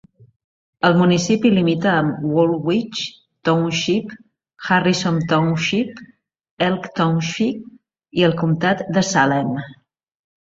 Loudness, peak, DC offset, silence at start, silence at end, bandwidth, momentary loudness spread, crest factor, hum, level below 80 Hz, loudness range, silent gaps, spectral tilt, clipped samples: -19 LUFS; -2 dBFS; under 0.1%; 0.85 s; 0.7 s; 7.8 kHz; 11 LU; 18 dB; none; -56 dBFS; 3 LU; 6.51-6.57 s; -5.5 dB/octave; under 0.1%